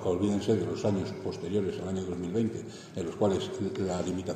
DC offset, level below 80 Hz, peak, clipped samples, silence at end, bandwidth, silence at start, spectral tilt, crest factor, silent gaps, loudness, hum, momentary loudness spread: under 0.1%; -66 dBFS; -14 dBFS; under 0.1%; 0 s; 13 kHz; 0 s; -6.5 dB/octave; 16 dB; none; -31 LUFS; none; 8 LU